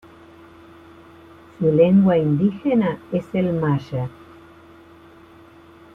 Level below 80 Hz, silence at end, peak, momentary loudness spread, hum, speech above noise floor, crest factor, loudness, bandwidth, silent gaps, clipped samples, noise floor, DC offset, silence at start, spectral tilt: -56 dBFS; 1.85 s; -4 dBFS; 13 LU; none; 28 dB; 18 dB; -19 LUFS; 4.7 kHz; none; under 0.1%; -47 dBFS; under 0.1%; 1.6 s; -10 dB/octave